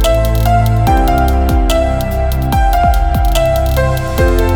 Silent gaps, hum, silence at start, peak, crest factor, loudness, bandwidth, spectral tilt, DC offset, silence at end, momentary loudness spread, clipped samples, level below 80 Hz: none; none; 0 s; 0 dBFS; 10 dB; -13 LUFS; over 20 kHz; -6 dB/octave; under 0.1%; 0 s; 3 LU; under 0.1%; -14 dBFS